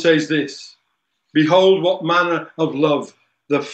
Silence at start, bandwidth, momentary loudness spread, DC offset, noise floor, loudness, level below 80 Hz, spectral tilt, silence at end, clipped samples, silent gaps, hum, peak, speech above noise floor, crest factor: 0 s; 8.4 kHz; 11 LU; under 0.1%; -71 dBFS; -17 LUFS; -74 dBFS; -5.5 dB/octave; 0 s; under 0.1%; none; none; -2 dBFS; 55 dB; 16 dB